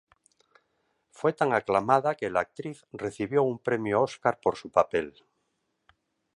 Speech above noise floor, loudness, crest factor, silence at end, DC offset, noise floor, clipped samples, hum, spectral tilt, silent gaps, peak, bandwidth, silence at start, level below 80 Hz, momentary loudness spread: 50 dB; -27 LUFS; 22 dB; 1.25 s; under 0.1%; -77 dBFS; under 0.1%; none; -6.5 dB/octave; none; -6 dBFS; 11 kHz; 1.2 s; -64 dBFS; 12 LU